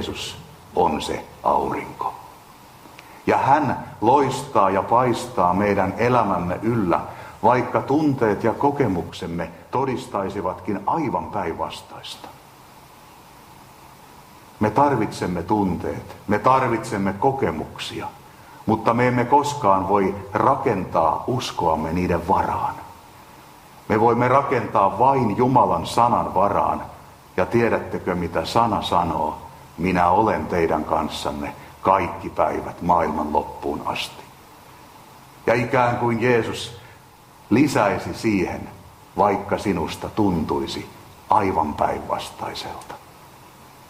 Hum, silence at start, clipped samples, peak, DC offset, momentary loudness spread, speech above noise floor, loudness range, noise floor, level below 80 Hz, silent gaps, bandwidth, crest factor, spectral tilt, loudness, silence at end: none; 0 s; under 0.1%; -2 dBFS; under 0.1%; 13 LU; 27 dB; 6 LU; -48 dBFS; -48 dBFS; none; 16 kHz; 20 dB; -6 dB/octave; -21 LUFS; 0.2 s